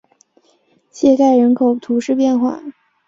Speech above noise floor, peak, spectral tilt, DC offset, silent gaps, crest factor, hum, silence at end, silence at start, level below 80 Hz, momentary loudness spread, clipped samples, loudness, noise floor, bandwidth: 44 dB; -2 dBFS; -6 dB/octave; under 0.1%; none; 14 dB; none; 0.35 s; 0.95 s; -60 dBFS; 11 LU; under 0.1%; -15 LUFS; -58 dBFS; 7.6 kHz